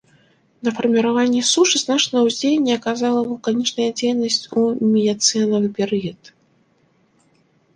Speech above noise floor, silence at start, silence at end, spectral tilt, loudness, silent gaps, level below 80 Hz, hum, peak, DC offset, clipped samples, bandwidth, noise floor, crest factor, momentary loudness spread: 42 dB; 0.65 s; 1.6 s; -3.5 dB/octave; -18 LUFS; none; -64 dBFS; none; -2 dBFS; under 0.1%; under 0.1%; 10 kHz; -60 dBFS; 18 dB; 6 LU